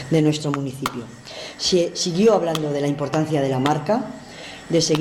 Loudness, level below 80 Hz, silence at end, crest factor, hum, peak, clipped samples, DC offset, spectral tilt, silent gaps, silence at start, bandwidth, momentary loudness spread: -21 LUFS; -56 dBFS; 0 s; 14 dB; none; -6 dBFS; under 0.1%; under 0.1%; -5 dB/octave; none; 0 s; 16 kHz; 17 LU